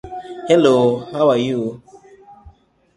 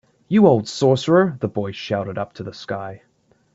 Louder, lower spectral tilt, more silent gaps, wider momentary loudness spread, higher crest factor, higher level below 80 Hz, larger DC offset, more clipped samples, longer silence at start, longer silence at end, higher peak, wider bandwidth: first, -16 LUFS vs -19 LUFS; about the same, -6.5 dB/octave vs -6.5 dB/octave; neither; about the same, 16 LU vs 15 LU; about the same, 18 dB vs 20 dB; first, -52 dBFS vs -58 dBFS; neither; neither; second, 0.05 s vs 0.3 s; about the same, 0.5 s vs 0.6 s; about the same, -2 dBFS vs 0 dBFS; first, 11.5 kHz vs 7.8 kHz